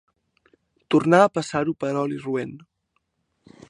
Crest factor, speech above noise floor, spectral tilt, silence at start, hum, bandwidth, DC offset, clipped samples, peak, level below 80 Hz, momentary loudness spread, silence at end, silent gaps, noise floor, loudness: 22 dB; 53 dB; -6 dB/octave; 0.9 s; none; 11 kHz; under 0.1%; under 0.1%; -2 dBFS; -64 dBFS; 12 LU; 1.15 s; none; -74 dBFS; -22 LUFS